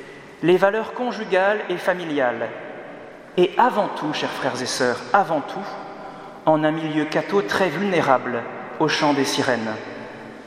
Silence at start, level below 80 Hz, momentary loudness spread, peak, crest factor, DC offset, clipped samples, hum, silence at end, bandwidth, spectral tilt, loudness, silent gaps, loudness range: 0 s; -66 dBFS; 16 LU; 0 dBFS; 22 dB; under 0.1%; under 0.1%; none; 0 s; 15.5 kHz; -4.5 dB/octave; -21 LUFS; none; 2 LU